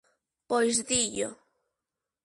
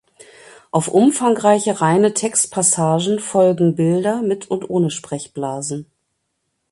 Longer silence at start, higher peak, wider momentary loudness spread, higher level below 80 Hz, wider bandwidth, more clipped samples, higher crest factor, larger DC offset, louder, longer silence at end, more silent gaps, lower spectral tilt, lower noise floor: second, 0.5 s vs 0.75 s; second, -12 dBFS vs 0 dBFS; about the same, 9 LU vs 11 LU; about the same, -64 dBFS vs -62 dBFS; about the same, 11.5 kHz vs 11.5 kHz; neither; about the same, 20 dB vs 18 dB; neither; second, -27 LUFS vs -17 LUFS; about the same, 0.9 s vs 0.9 s; neither; second, -1.5 dB/octave vs -5 dB/octave; first, -88 dBFS vs -72 dBFS